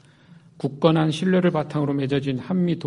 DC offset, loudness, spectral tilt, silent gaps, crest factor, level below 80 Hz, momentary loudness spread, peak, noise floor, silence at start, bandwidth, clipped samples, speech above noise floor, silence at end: under 0.1%; -22 LUFS; -7.5 dB/octave; none; 20 dB; -60 dBFS; 6 LU; -2 dBFS; -50 dBFS; 0.3 s; 11 kHz; under 0.1%; 29 dB; 0 s